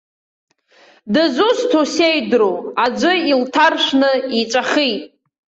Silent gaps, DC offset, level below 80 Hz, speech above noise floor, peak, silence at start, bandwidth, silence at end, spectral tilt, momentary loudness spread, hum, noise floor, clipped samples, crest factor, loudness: none; under 0.1%; -62 dBFS; 35 dB; -2 dBFS; 1.05 s; 8.2 kHz; 0.55 s; -3.5 dB/octave; 5 LU; none; -50 dBFS; under 0.1%; 14 dB; -15 LUFS